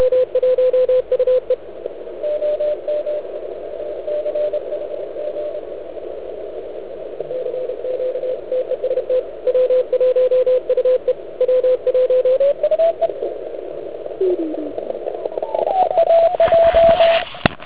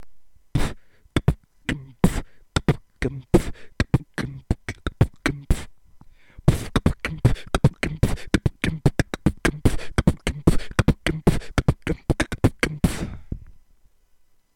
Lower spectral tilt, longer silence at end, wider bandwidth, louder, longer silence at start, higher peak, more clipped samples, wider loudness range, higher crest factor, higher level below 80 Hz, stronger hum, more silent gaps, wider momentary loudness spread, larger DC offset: first, -9 dB/octave vs -6 dB/octave; second, 0 s vs 1.05 s; second, 4 kHz vs 17 kHz; first, -18 LUFS vs -24 LUFS; about the same, 0 s vs 0 s; first, 0 dBFS vs -6 dBFS; neither; first, 9 LU vs 3 LU; about the same, 18 dB vs 18 dB; second, -48 dBFS vs -30 dBFS; neither; neither; first, 16 LU vs 9 LU; first, 1% vs under 0.1%